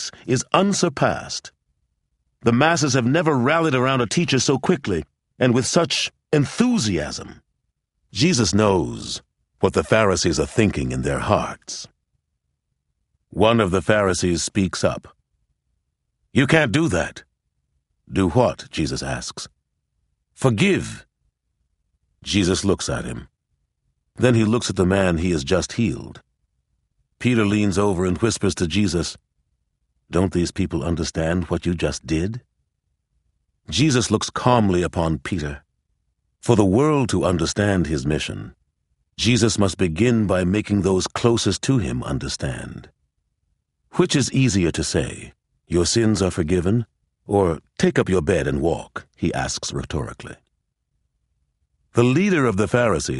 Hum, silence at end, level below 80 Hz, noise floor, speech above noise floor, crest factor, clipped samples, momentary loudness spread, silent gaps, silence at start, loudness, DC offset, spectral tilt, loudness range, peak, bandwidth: none; 0 s; -42 dBFS; -75 dBFS; 56 dB; 20 dB; under 0.1%; 12 LU; none; 0 s; -20 LUFS; under 0.1%; -5 dB/octave; 5 LU; 0 dBFS; 11.5 kHz